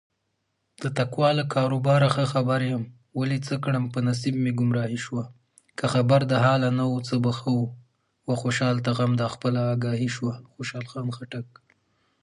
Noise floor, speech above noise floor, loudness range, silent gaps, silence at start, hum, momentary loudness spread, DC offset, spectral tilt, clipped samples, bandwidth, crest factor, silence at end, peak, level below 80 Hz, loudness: -76 dBFS; 52 dB; 3 LU; none; 0.8 s; none; 13 LU; under 0.1%; -6.5 dB/octave; under 0.1%; 11 kHz; 18 dB; 0.8 s; -8 dBFS; -64 dBFS; -25 LUFS